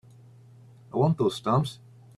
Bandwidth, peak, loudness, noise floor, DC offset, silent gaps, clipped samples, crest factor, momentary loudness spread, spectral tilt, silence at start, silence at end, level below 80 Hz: 12.5 kHz; -10 dBFS; -26 LUFS; -52 dBFS; under 0.1%; none; under 0.1%; 18 dB; 11 LU; -7.5 dB/octave; 0.95 s; 0.4 s; -62 dBFS